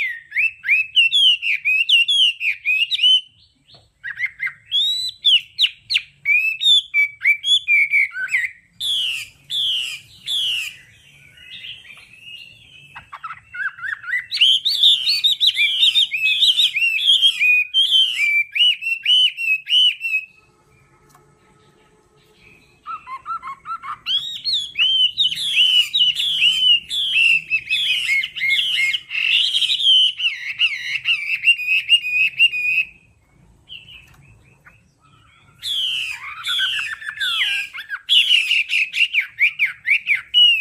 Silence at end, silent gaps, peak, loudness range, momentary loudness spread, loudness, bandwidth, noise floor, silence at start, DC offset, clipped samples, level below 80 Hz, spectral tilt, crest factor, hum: 0 s; none; -4 dBFS; 13 LU; 15 LU; -15 LUFS; 15.5 kHz; -55 dBFS; 0 s; under 0.1%; under 0.1%; -64 dBFS; 3 dB/octave; 16 dB; none